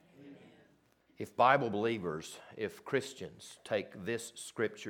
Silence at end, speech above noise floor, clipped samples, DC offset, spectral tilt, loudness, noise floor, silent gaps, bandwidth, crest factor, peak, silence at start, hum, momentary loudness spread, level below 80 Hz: 0 s; 34 dB; under 0.1%; under 0.1%; -4.5 dB/octave; -35 LUFS; -69 dBFS; none; 19 kHz; 24 dB; -12 dBFS; 0.2 s; none; 20 LU; -76 dBFS